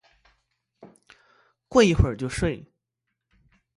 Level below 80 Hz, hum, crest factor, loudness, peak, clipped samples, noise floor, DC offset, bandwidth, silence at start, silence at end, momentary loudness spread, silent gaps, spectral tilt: -38 dBFS; none; 24 dB; -23 LUFS; -4 dBFS; under 0.1%; -82 dBFS; under 0.1%; 11.5 kHz; 0.85 s; 1.2 s; 10 LU; none; -6 dB/octave